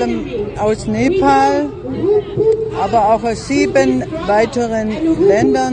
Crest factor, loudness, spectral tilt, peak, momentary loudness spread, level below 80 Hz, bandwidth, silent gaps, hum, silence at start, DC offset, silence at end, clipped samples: 14 dB; -15 LUFS; -6 dB/octave; 0 dBFS; 7 LU; -36 dBFS; 9.8 kHz; none; none; 0 s; under 0.1%; 0 s; under 0.1%